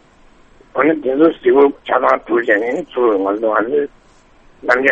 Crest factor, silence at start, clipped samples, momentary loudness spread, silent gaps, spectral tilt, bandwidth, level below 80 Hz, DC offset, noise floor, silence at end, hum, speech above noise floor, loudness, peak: 16 dB; 0.75 s; under 0.1%; 8 LU; none; -6.5 dB/octave; 7.8 kHz; -52 dBFS; under 0.1%; -48 dBFS; 0 s; none; 33 dB; -15 LUFS; 0 dBFS